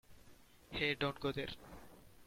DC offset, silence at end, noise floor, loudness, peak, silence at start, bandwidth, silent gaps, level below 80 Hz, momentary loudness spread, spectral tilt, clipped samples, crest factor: under 0.1%; 0 s; -62 dBFS; -39 LUFS; -22 dBFS; 0.1 s; 16.5 kHz; none; -62 dBFS; 22 LU; -5.5 dB/octave; under 0.1%; 20 dB